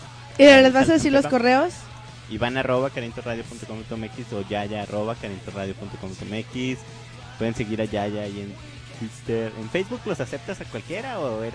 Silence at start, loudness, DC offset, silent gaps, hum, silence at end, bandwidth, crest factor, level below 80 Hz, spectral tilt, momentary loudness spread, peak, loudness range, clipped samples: 0 s; -22 LUFS; under 0.1%; none; 60 Hz at -45 dBFS; 0 s; 10.5 kHz; 22 dB; -50 dBFS; -5 dB/octave; 19 LU; -2 dBFS; 12 LU; under 0.1%